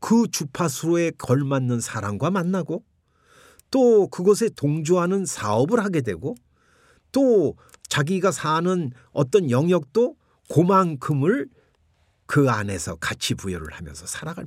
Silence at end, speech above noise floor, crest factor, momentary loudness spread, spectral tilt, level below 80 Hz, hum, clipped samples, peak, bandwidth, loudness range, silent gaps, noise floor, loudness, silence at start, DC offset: 0 s; 42 dB; 18 dB; 12 LU; -6 dB/octave; -58 dBFS; none; under 0.1%; -4 dBFS; 16 kHz; 3 LU; none; -64 dBFS; -22 LUFS; 0 s; under 0.1%